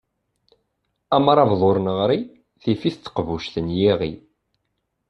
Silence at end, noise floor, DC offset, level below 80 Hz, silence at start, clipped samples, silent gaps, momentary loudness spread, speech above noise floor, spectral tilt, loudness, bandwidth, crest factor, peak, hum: 0.9 s; -75 dBFS; under 0.1%; -52 dBFS; 1.1 s; under 0.1%; none; 12 LU; 55 dB; -8 dB/octave; -20 LUFS; 8.2 kHz; 20 dB; -2 dBFS; none